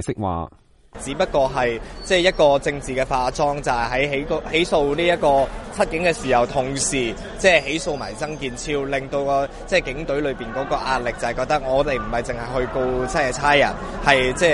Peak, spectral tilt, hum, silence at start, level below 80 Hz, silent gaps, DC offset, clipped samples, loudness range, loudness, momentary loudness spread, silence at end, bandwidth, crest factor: 0 dBFS; -4 dB/octave; none; 0 s; -36 dBFS; none; under 0.1%; under 0.1%; 3 LU; -21 LUFS; 9 LU; 0 s; 11.5 kHz; 20 dB